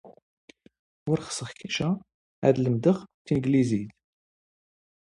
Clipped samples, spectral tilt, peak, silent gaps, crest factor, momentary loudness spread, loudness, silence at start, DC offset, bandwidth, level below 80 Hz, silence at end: under 0.1%; -6.5 dB/octave; -6 dBFS; 0.22-0.48 s, 0.79-1.06 s, 2.14-2.42 s, 3.14-3.25 s; 22 dB; 11 LU; -27 LUFS; 0.05 s; under 0.1%; 11 kHz; -60 dBFS; 1.15 s